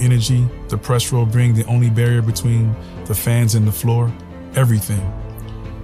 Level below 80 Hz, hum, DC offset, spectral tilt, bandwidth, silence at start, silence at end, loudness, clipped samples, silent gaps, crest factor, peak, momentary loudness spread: -36 dBFS; none; under 0.1%; -6 dB/octave; 15.5 kHz; 0 s; 0 s; -17 LUFS; under 0.1%; none; 14 dB; -2 dBFS; 12 LU